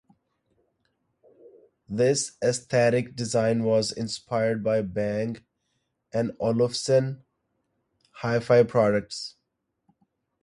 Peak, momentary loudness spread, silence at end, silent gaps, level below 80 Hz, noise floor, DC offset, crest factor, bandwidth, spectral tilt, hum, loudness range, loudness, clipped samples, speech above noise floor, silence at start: -8 dBFS; 12 LU; 1.15 s; none; -62 dBFS; -79 dBFS; under 0.1%; 20 dB; 11.5 kHz; -5 dB/octave; none; 3 LU; -25 LUFS; under 0.1%; 55 dB; 1.9 s